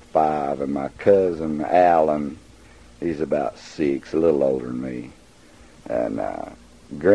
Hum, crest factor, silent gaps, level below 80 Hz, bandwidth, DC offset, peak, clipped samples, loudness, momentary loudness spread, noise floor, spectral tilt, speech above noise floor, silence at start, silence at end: none; 18 dB; none; -50 dBFS; 10.5 kHz; 0.1%; -4 dBFS; under 0.1%; -22 LUFS; 15 LU; -49 dBFS; -7.5 dB/octave; 28 dB; 0.15 s; 0 s